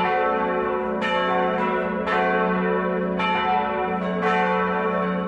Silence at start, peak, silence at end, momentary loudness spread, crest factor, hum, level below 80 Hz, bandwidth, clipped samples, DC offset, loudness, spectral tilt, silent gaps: 0 s; -10 dBFS; 0 s; 3 LU; 12 dB; none; -52 dBFS; 8.4 kHz; under 0.1%; under 0.1%; -22 LUFS; -7 dB/octave; none